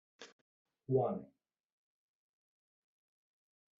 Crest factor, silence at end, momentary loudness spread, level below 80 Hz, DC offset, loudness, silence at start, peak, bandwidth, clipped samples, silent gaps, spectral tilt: 24 dB; 2.55 s; 23 LU; -80 dBFS; under 0.1%; -37 LUFS; 0.2 s; -20 dBFS; 4.5 kHz; under 0.1%; 0.32-0.65 s; -8.5 dB/octave